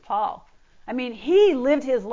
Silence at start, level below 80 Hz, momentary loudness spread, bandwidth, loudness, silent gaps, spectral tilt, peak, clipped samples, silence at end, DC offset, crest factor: 0.1 s; -58 dBFS; 13 LU; 7.6 kHz; -22 LUFS; none; -5 dB/octave; -8 dBFS; under 0.1%; 0 s; under 0.1%; 14 dB